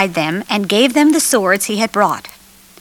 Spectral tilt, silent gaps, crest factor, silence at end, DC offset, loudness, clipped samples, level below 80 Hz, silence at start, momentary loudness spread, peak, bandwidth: -3 dB/octave; none; 14 dB; 0.55 s; under 0.1%; -14 LUFS; under 0.1%; -58 dBFS; 0 s; 7 LU; 0 dBFS; 18.5 kHz